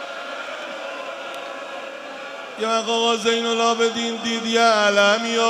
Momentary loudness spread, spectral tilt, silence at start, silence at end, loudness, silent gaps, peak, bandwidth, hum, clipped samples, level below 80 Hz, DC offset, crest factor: 17 LU; -2 dB/octave; 0 s; 0 s; -20 LUFS; none; -2 dBFS; 13.5 kHz; none; under 0.1%; -76 dBFS; under 0.1%; 18 dB